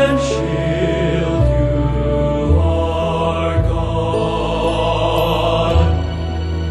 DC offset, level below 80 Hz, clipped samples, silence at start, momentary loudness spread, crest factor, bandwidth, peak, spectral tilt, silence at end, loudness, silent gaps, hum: under 0.1%; -22 dBFS; under 0.1%; 0 s; 3 LU; 14 dB; 12.5 kHz; -2 dBFS; -7 dB/octave; 0 s; -17 LUFS; none; none